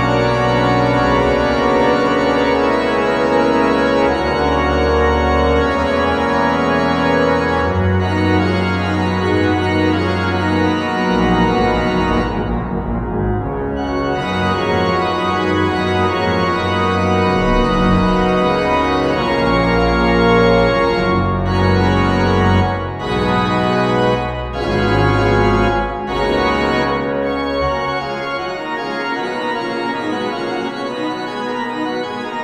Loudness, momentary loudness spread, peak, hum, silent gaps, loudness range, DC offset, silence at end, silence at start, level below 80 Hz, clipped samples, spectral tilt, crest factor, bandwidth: -16 LUFS; 7 LU; 0 dBFS; none; none; 5 LU; under 0.1%; 0 s; 0 s; -30 dBFS; under 0.1%; -6.5 dB/octave; 14 dB; 11.5 kHz